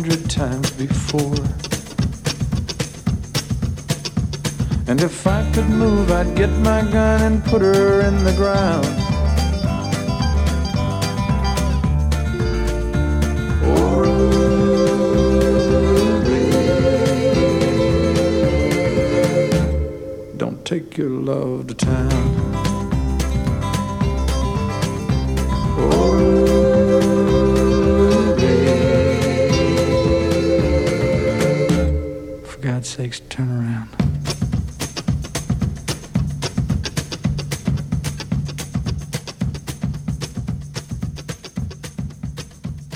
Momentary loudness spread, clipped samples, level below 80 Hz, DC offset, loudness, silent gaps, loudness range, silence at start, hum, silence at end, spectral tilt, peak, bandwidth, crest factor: 11 LU; under 0.1%; -26 dBFS; under 0.1%; -19 LUFS; none; 8 LU; 0 s; none; 0 s; -6.5 dB/octave; -2 dBFS; 16 kHz; 16 dB